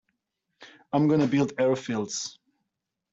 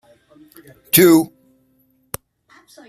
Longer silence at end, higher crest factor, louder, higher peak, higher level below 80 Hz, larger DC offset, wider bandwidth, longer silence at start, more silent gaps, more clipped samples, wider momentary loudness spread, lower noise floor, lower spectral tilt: second, 0.8 s vs 1.65 s; about the same, 16 dB vs 20 dB; second, -26 LUFS vs -13 LUFS; second, -12 dBFS vs 0 dBFS; second, -68 dBFS vs -58 dBFS; neither; second, 8 kHz vs 15.5 kHz; second, 0.6 s vs 0.95 s; neither; neither; second, 10 LU vs 22 LU; first, -84 dBFS vs -60 dBFS; first, -5.5 dB/octave vs -4 dB/octave